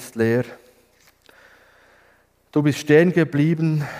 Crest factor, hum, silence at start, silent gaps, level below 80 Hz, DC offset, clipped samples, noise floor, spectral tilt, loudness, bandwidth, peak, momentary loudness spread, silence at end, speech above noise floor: 20 dB; none; 0 s; none; -64 dBFS; under 0.1%; under 0.1%; -58 dBFS; -7 dB/octave; -19 LUFS; 15.5 kHz; -2 dBFS; 9 LU; 0 s; 40 dB